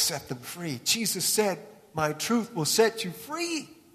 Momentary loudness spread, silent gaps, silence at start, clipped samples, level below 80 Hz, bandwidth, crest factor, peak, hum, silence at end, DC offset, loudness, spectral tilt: 12 LU; none; 0 s; under 0.1%; -66 dBFS; 14 kHz; 20 dB; -8 dBFS; none; 0.2 s; under 0.1%; -27 LUFS; -2.5 dB/octave